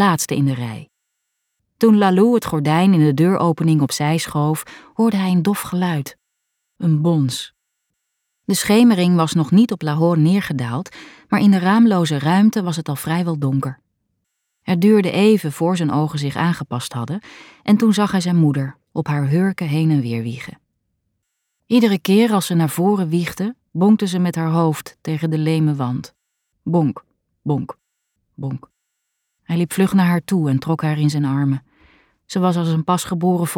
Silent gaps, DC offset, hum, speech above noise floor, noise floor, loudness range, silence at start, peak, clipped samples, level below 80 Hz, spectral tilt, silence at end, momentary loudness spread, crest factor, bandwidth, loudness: none; under 0.1%; none; 58 dB; -75 dBFS; 6 LU; 0 s; -2 dBFS; under 0.1%; -58 dBFS; -6.5 dB/octave; 0 s; 12 LU; 14 dB; 17.5 kHz; -18 LUFS